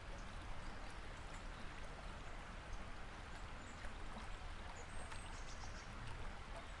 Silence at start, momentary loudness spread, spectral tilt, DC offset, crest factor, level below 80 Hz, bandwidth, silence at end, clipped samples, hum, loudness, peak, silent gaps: 0 s; 1 LU; -4 dB/octave; under 0.1%; 16 dB; -52 dBFS; 11.5 kHz; 0 s; under 0.1%; none; -53 LUFS; -34 dBFS; none